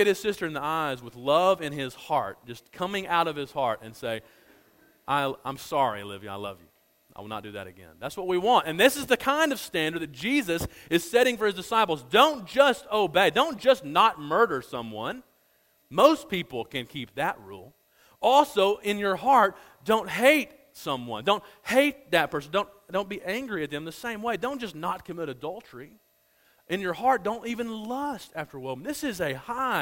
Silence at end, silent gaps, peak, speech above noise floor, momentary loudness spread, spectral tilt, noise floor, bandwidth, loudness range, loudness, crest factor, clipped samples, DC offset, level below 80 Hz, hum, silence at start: 0 s; none; -2 dBFS; 40 dB; 16 LU; -4 dB/octave; -66 dBFS; 16.5 kHz; 9 LU; -26 LUFS; 24 dB; under 0.1%; under 0.1%; -62 dBFS; none; 0 s